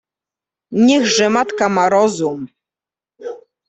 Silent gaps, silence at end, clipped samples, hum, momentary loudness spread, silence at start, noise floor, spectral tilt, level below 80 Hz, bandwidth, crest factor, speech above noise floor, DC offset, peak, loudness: none; 0.3 s; under 0.1%; none; 19 LU; 0.7 s; -90 dBFS; -4 dB/octave; -60 dBFS; 8.4 kHz; 14 dB; 75 dB; under 0.1%; -2 dBFS; -15 LUFS